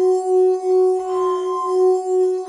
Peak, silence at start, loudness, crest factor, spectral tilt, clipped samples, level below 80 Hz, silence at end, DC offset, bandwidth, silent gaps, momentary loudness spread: -8 dBFS; 0 s; -18 LUFS; 8 dB; -4.5 dB/octave; under 0.1%; -68 dBFS; 0 s; under 0.1%; 11 kHz; none; 4 LU